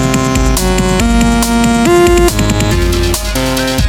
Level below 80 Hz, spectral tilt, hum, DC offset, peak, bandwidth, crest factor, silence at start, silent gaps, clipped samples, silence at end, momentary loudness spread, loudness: -16 dBFS; -4.5 dB/octave; none; under 0.1%; 0 dBFS; 18 kHz; 10 dB; 0 s; none; under 0.1%; 0 s; 5 LU; -11 LUFS